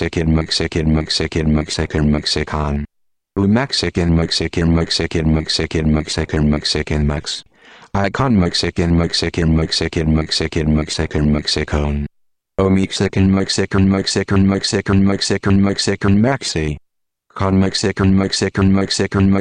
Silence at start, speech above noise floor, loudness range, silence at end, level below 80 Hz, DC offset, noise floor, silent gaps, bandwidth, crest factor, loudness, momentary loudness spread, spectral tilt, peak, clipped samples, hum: 0 s; 45 dB; 2 LU; 0 s; -28 dBFS; under 0.1%; -61 dBFS; none; 10.5 kHz; 14 dB; -17 LUFS; 6 LU; -5.5 dB/octave; -2 dBFS; under 0.1%; none